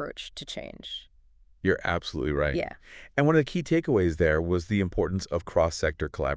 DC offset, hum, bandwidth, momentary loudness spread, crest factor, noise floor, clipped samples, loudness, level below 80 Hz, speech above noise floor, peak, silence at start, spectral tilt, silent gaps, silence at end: under 0.1%; none; 8 kHz; 14 LU; 20 dB; -57 dBFS; under 0.1%; -27 LUFS; -40 dBFS; 31 dB; -8 dBFS; 0 s; -6 dB/octave; none; 0 s